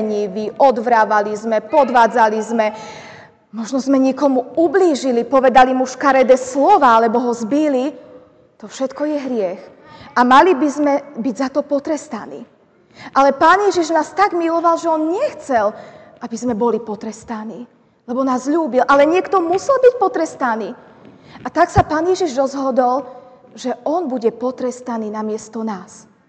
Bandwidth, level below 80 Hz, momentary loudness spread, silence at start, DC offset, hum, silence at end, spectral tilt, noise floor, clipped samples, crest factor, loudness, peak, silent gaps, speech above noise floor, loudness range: 9 kHz; -46 dBFS; 16 LU; 0 s; under 0.1%; none; 0.45 s; -5 dB/octave; -44 dBFS; under 0.1%; 14 dB; -16 LUFS; -2 dBFS; none; 29 dB; 7 LU